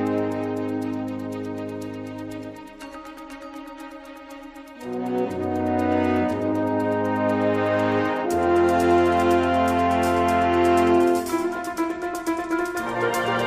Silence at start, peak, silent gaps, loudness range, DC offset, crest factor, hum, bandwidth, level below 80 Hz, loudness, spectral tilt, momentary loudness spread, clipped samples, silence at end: 0 s; -6 dBFS; none; 15 LU; under 0.1%; 16 dB; none; 15.5 kHz; -50 dBFS; -22 LUFS; -6 dB/octave; 20 LU; under 0.1%; 0 s